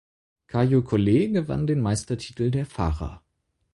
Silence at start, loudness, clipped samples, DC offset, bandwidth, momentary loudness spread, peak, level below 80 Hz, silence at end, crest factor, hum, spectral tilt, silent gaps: 0.55 s; -24 LUFS; under 0.1%; under 0.1%; 11.5 kHz; 10 LU; -8 dBFS; -40 dBFS; 0.55 s; 16 dB; none; -7 dB/octave; none